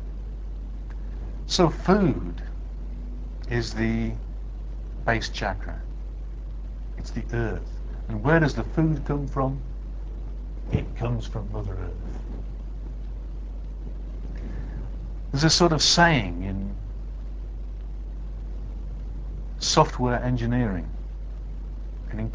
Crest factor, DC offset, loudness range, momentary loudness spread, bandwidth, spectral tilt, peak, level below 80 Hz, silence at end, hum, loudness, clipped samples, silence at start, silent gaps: 24 dB; under 0.1%; 11 LU; 17 LU; 8 kHz; -4.5 dB/octave; -4 dBFS; -32 dBFS; 0 s; none; -27 LUFS; under 0.1%; 0 s; none